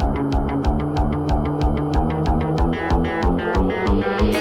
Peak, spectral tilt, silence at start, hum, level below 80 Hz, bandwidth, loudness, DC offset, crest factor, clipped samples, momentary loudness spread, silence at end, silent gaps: -8 dBFS; -7.5 dB/octave; 0 s; none; -24 dBFS; 12 kHz; -21 LUFS; under 0.1%; 12 dB; under 0.1%; 2 LU; 0 s; none